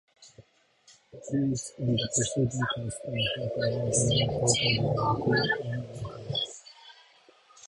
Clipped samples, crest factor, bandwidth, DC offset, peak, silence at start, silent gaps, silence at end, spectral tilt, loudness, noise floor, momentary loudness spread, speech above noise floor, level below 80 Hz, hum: under 0.1%; 20 dB; 11.5 kHz; under 0.1%; -8 dBFS; 0.2 s; none; 0 s; -4 dB/octave; -28 LUFS; -62 dBFS; 12 LU; 34 dB; -54 dBFS; none